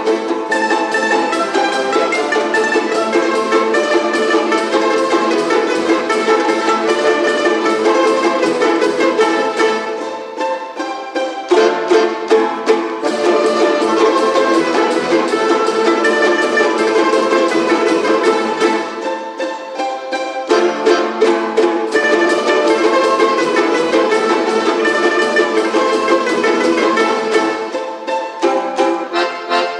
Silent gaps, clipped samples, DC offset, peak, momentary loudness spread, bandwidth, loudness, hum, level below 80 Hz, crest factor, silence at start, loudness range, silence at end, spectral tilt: none; under 0.1%; under 0.1%; 0 dBFS; 8 LU; 11.5 kHz; -14 LUFS; none; -64 dBFS; 14 dB; 0 s; 3 LU; 0 s; -3 dB/octave